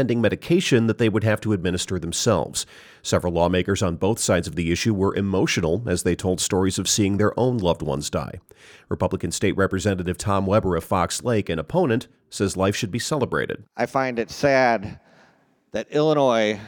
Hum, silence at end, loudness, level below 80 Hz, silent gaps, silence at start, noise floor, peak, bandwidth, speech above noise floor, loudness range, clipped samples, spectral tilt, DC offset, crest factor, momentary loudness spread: none; 0 s; -22 LUFS; -46 dBFS; none; 0 s; -59 dBFS; -6 dBFS; 19 kHz; 37 dB; 2 LU; under 0.1%; -5 dB/octave; under 0.1%; 16 dB; 8 LU